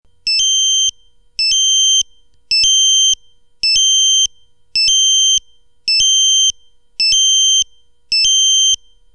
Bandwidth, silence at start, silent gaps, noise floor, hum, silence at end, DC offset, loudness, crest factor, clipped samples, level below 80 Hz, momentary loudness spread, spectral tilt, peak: 11 kHz; 0.25 s; none; -37 dBFS; none; 0.4 s; 0.2%; -10 LUFS; 12 dB; under 0.1%; -48 dBFS; 9 LU; 5.5 dB/octave; -2 dBFS